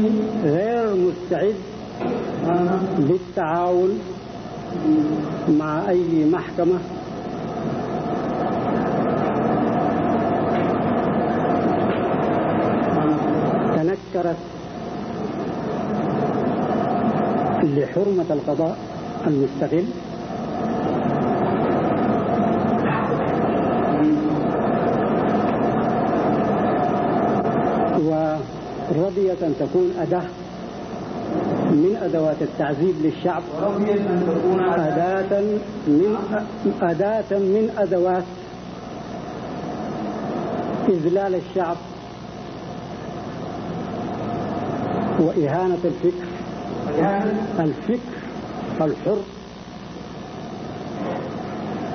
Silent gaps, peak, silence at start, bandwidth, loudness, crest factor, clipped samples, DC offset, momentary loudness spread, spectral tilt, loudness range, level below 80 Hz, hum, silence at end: none; -6 dBFS; 0 s; 6.6 kHz; -22 LUFS; 16 dB; under 0.1%; under 0.1%; 12 LU; -8.5 dB/octave; 5 LU; -50 dBFS; none; 0 s